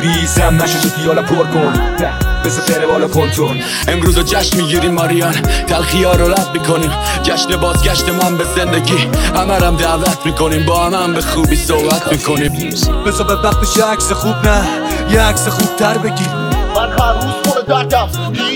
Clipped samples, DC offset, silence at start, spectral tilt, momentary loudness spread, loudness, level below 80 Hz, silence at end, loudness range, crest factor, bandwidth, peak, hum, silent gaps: under 0.1%; under 0.1%; 0 s; -4.5 dB/octave; 4 LU; -13 LUFS; -20 dBFS; 0 s; 1 LU; 12 dB; 17.5 kHz; 0 dBFS; none; none